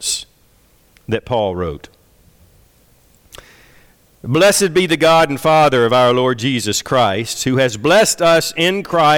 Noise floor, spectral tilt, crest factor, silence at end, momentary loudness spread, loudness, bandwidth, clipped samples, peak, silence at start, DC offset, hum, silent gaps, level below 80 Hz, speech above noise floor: -53 dBFS; -4 dB/octave; 12 dB; 0 s; 11 LU; -14 LUFS; 18.5 kHz; under 0.1%; -4 dBFS; 0 s; under 0.1%; none; none; -46 dBFS; 39 dB